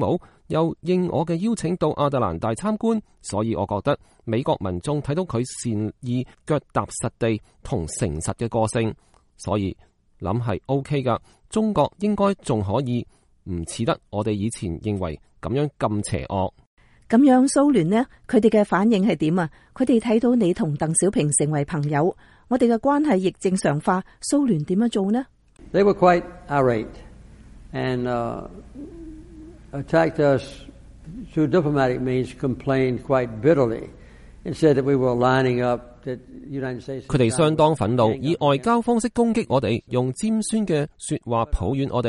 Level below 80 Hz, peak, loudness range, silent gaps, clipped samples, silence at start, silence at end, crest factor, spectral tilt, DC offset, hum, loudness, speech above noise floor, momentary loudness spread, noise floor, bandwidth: -44 dBFS; -4 dBFS; 6 LU; 16.66-16.77 s; under 0.1%; 0 s; 0 s; 18 dB; -6 dB/octave; under 0.1%; none; -22 LUFS; 23 dB; 11 LU; -45 dBFS; 11.5 kHz